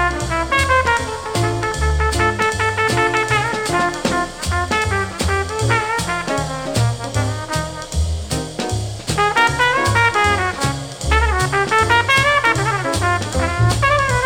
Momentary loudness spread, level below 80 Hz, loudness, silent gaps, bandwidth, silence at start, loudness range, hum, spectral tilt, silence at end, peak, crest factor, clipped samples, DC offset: 8 LU; -28 dBFS; -17 LUFS; none; 18 kHz; 0 s; 5 LU; none; -4 dB/octave; 0 s; -2 dBFS; 16 dB; under 0.1%; under 0.1%